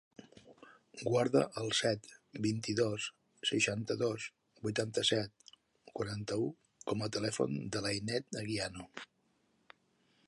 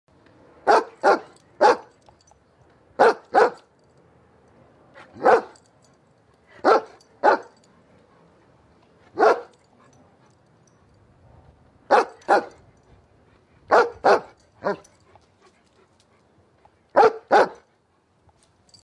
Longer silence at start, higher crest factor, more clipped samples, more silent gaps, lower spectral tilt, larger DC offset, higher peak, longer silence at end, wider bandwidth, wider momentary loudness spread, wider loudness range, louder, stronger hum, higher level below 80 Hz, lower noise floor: second, 0.2 s vs 0.65 s; about the same, 22 dB vs 22 dB; neither; neither; about the same, -4 dB/octave vs -4 dB/octave; neither; second, -16 dBFS vs -2 dBFS; about the same, 1.25 s vs 1.3 s; about the same, 11.5 kHz vs 11 kHz; first, 14 LU vs 11 LU; about the same, 4 LU vs 6 LU; second, -36 LUFS vs -20 LUFS; neither; about the same, -68 dBFS vs -68 dBFS; first, -75 dBFS vs -64 dBFS